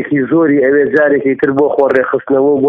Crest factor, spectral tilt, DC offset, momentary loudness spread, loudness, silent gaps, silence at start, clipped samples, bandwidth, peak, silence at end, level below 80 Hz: 10 dB; -9.5 dB/octave; under 0.1%; 3 LU; -11 LUFS; none; 0 s; under 0.1%; 4.8 kHz; 0 dBFS; 0 s; -54 dBFS